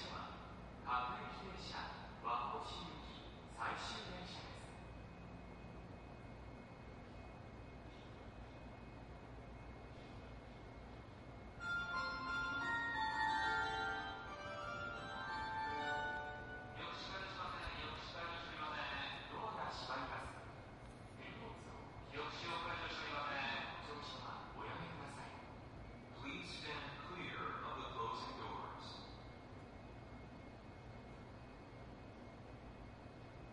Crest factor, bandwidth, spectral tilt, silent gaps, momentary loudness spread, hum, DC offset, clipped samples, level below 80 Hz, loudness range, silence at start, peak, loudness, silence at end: 20 dB; 11 kHz; -4.5 dB/octave; none; 14 LU; none; under 0.1%; under 0.1%; -62 dBFS; 14 LU; 0 s; -28 dBFS; -47 LUFS; 0 s